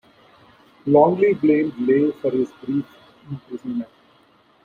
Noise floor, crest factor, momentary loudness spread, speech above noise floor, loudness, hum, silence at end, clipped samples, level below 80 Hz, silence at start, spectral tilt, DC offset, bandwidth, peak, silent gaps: -56 dBFS; 18 dB; 20 LU; 37 dB; -20 LUFS; none; 0.8 s; under 0.1%; -64 dBFS; 0.85 s; -9.5 dB/octave; under 0.1%; 4.7 kHz; -2 dBFS; none